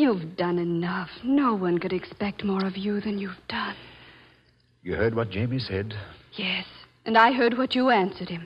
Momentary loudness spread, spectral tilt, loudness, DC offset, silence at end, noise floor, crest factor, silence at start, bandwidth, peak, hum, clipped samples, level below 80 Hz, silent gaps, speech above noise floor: 13 LU; -8 dB/octave; -26 LUFS; under 0.1%; 0 s; -62 dBFS; 20 dB; 0 s; 8.2 kHz; -6 dBFS; none; under 0.1%; -56 dBFS; none; 36 dB